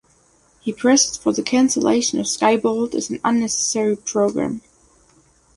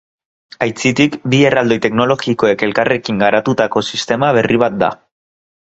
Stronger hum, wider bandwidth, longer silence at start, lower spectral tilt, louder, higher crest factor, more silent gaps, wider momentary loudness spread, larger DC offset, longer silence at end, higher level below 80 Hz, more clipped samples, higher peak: neither; first, 11.5 kHz vs 8.2 kHz; about the same, 0.65 s vs 0.6 s; second, -3 dB/octave vs -5.5 dB/octave; second, -19 LUFS vs -14 LUFS; about the same, 18 dB vs 14 dB; neither; first, 9 LU vs 6 LU; neither; first, 0.95 s vs 0.7 s; second, -58 dBFS vs -52 dBFS; neither; about the same, -2 dBFS vs 0 dBFS